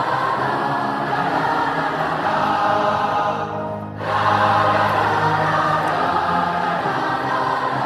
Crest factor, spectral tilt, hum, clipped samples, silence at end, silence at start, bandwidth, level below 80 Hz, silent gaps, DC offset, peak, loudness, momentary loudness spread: 14 dB; -5.5 dB/octave; none; under 0.1%; 0 s; 0 s; 13 kHz; -54 dBFS; none; under 0.1%; -6 dBFS; -19 LUFS; 5 LU